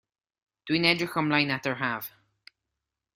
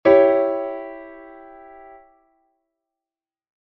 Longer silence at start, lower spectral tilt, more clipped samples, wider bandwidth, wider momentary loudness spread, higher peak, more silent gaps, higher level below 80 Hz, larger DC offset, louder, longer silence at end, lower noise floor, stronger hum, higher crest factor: first, 0.65 s vs 0.05 s; about the same, -5 dB/octave vs -4 dB/octave; neither; first, 15.5 kHz vs 5.4 kHz; second, 14 LU vs 29 LU; second, -6 dBFS vs -2 dBFS; neither; second, -68 dBFS vs -60 dBFS; neither; second, -26 LUFS vs -19 LUFS; second, 1.05 s vs 2.55 s; second, -86 dBFS vs under -90 dBFS; neither; about the same, 24 dB vs 22 dB